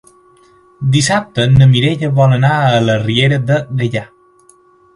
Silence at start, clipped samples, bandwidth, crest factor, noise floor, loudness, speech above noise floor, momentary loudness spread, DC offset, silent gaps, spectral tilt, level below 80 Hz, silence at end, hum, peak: 0.8 s; under 0.1%; 11.5 kHz; 14 dB; -48 dBFS; -12 LUFS; 37 dB; 9 LU; under 0.1%; none; -5.5 dB/octave; -38 dBFS; 0.9 s; none; 0 dBFS